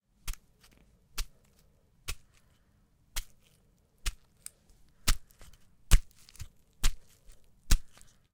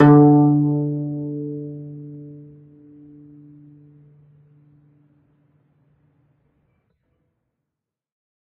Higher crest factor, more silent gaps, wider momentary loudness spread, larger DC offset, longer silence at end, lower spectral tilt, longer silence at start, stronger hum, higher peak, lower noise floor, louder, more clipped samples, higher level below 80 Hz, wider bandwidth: first, 30 dB vs 22 dB; neither; about the same, 25 LU vs 27 LU; neither; second, 0.5 s vs 6.05 s; second, -2.5 dB/octave vs -10 dB/octave; first, 0.25 s vs 0 s; neither; second, -4 dBFS vs 0 dBFS; second, -67 dBFS vs -85 dBFS; second, -37 LUFS vs -17 LUFS; neither; first, -36 dBFS vs -58 dBFS; first, 18 kHz vs 3.4 kHz